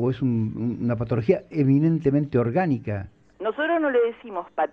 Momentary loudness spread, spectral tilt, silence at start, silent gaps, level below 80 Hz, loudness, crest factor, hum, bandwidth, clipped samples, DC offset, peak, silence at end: 11 LU; -10 dB/octave; 0 s; none; -54 dBFS; -24 LUFS; 16 dB; none; 6 kHz; under 0.1%; under 0.1%; -8 dBFS; 0.05 s